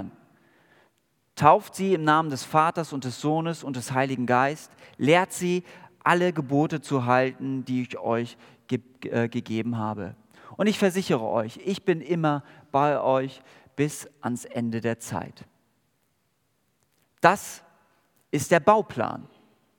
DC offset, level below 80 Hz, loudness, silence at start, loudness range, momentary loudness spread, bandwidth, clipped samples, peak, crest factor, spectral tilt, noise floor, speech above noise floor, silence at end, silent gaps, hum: under 0.1%; -72 dBFS; -25 LUFS; 0 s; 6 LU; 12 LU; 18 kHz; under 0.1%; -2 dBFS; 24 dB; -5.5 dB/octave; -72 dBFS; 47 dB; 0.5 s; none; none